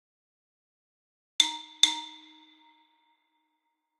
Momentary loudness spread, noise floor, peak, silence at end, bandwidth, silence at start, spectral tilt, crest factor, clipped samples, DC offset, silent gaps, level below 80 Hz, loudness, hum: 19 LU; -80 dBFS; -2 dBFS; 1.85 s; 16 kHz; 1.4 s; 4.5 dB/octave; 32 dB; under 0.1%; under 0.1%; none; under -90 dBFS; -25 LUFS; none